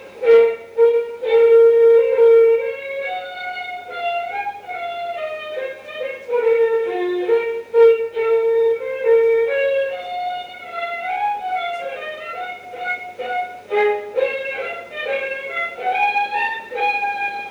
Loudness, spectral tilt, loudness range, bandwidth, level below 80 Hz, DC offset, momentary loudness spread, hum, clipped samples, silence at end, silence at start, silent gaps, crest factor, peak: -19 LUFS; -4 dB/octave; 10 LU; 5.4 kHz; -68 dBFS; under 0.1%; 15 LU; none; under 0.1%; 0 s; 0 s; none; 14 dB; -4 dBFS